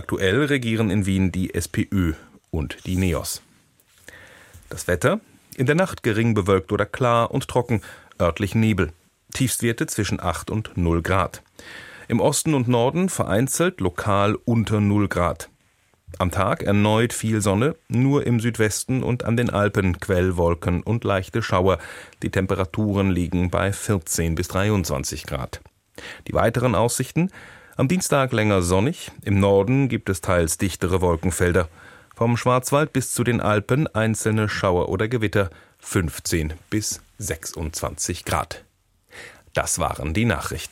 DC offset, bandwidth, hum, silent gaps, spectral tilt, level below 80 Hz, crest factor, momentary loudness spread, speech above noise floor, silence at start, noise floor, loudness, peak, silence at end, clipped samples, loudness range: under 0.1%; 16.5 kHz; none; none; -5.5 dB/octave; -42 dBFS; 18 dB; 10 LU; 41 dB; 0 s; -62 dBFS; -22 LUFS; -4 dBFS; 0.05 s; under 0.1%; 5 LU